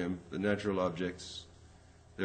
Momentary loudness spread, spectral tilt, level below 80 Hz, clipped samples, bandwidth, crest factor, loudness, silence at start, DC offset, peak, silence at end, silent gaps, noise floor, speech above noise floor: 18 LU; -6 dB/octave; -62 dBFS; under 0.1%; 8.8 kHz; 20 dB; -35 LUFS; 0 s; under 0.1%; -16 dBFS; 0 s; none; -58 dBFS; 23 dB